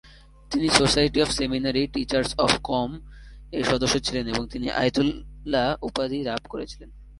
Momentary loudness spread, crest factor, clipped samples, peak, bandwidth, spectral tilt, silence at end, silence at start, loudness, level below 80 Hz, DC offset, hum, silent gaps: 13 LU; 24 dB; under 0.1%; -2 dBFS; 11.5 kHz; -4 dB/octave; 0 s; 0.05 s; -24 LUFS; -42 dBFS; under 0.1%; none; none